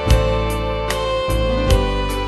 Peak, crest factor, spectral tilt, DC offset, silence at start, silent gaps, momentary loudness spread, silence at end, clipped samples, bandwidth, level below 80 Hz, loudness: -2 dBFS; 16 dB; -5.5 dB/octave; under 0.1%; 0 s; none; 5 LU; 0 s; under 0.1%; 12.5 kHz; -22 dBFS; -19 LUFS